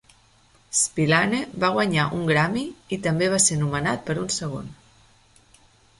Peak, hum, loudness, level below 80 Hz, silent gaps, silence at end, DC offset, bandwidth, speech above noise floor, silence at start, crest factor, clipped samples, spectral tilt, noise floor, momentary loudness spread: -6 dBFS; none; -22 LUFS; -54 dBFS; none; 1.25 s; under 0.1%; 11.5 kHz; 35 dB; 0.7 s; 20 dB; under 0.1%; -4 dB/octave; -58 dBFS; 10 LU